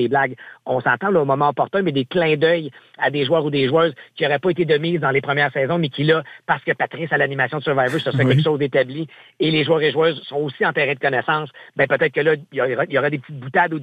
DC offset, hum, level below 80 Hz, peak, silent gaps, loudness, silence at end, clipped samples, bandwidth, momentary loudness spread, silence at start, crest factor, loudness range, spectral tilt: under 0.1%; none; -62 dBFS; -4 dBFS; none; -19 LUFS; 0 s; under 0.1%; 9 kHz; 6 LU; 0 s; 16 dB; 1 LU; -7.5 dB/octave